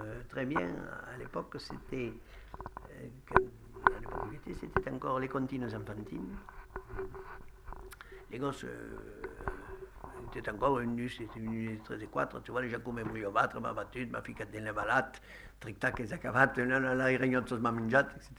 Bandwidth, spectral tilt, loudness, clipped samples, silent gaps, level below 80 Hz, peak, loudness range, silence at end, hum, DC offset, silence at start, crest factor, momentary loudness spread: over 20 kHz; -6.5 dB/octave; -35 LUFS; under 0.1%; none; -52 dBFS; -6 dBFS; 12 LU; 0 s; none; under 0.1%; 0 s; 30 dB; 19 LU